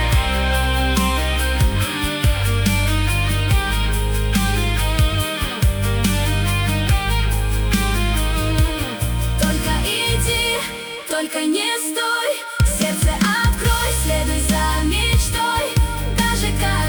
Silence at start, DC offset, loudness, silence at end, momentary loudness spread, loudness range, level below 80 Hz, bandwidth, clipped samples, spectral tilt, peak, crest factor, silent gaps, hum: 0 s; under 0.1%; -19 LUFS; 0 s; 3 LU; 1 LU; -22 dBFS; over 20 kHz; under 0.1%; -4 dB/octave; -6 dBFS; 12 dB; none; none